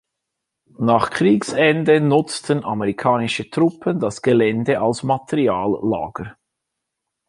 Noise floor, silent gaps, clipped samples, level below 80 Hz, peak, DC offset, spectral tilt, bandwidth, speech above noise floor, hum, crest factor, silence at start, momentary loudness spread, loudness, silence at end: -80 dBFS; none; under 0.1%; -54 dBFS; -2 dBFS; under 0.1%; -6 dB/octave; 11.5 kHz; 62 dB; none; 18 dB; 0.8 s; 7 LU; -19 LUFS; 0.95 s